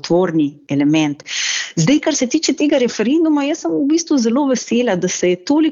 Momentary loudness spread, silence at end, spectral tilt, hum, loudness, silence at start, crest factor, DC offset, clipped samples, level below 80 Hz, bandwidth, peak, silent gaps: 4 LU; 0 s; -4.5 dB/octave; none; -16 LUFS; 0.05 s; 12 dB; under 0.1%; under 0.1%; -58 dBFS; 7.6 kHz; -2 dBFS; none